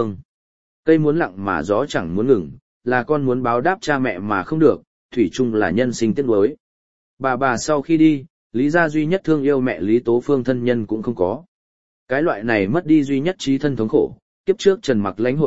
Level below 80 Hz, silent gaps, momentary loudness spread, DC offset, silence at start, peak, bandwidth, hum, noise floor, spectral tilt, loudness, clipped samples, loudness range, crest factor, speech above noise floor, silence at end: -52 dBFS; 0.25-0.83 s, 2.62-2.81 s, 4.87-5.09 s, 6.60-7.17 s, 8.30-8.50 s, 11.48-12.07 s, 14.22-14.44 s; 8 LU; 1%; 0 s; -2 dBFS; 8 kHz; none; under -90 dBFS; -6.5 dB/octave; -19 LUFS; under 0.1%; 2 LU; 18 dB; over 72 dB; 0 s